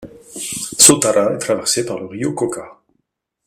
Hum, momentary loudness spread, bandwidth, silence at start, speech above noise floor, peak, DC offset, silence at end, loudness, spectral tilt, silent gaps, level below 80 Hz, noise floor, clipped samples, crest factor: none; 18 LU; 16 kHz; 0 s; 55 dB; 0 dBFS; under 0.1%; 0.75 s; -15 LUFS; -2.5 dB/octave; none; -54 dBFS; -73 dBFS; 0.1%; 18 dB